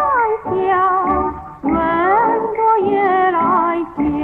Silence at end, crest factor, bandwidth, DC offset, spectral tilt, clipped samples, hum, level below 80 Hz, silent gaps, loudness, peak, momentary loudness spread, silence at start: 0 s; 12 dB; 4.2 kHz; under 0.1%; -8.5 dB/octave; under 0.1%; none; -40 dBFS; none; -16 LUFS; -4 dBFS; 5 LU; 0 s